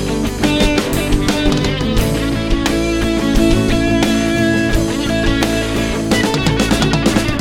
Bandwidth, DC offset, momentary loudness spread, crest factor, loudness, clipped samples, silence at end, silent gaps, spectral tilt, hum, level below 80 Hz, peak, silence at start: 17 kHz; under 0.1%; 3 LU; 14 dB; -15 LUFS; under 0.1%; 0 s; none; -5 dB/octave; none; -22 dBFS; 0 dBFS; 0 s